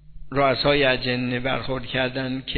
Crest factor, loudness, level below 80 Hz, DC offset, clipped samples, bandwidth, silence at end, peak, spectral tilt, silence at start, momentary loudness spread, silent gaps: 18 dB; -22 LUFS; -42 dBFS; under 0.1%; under 0.1%; 4.6 kHz; 0 s; -4 dBFS; -8.5 dB/octave; 0.1 s; 8 LU; none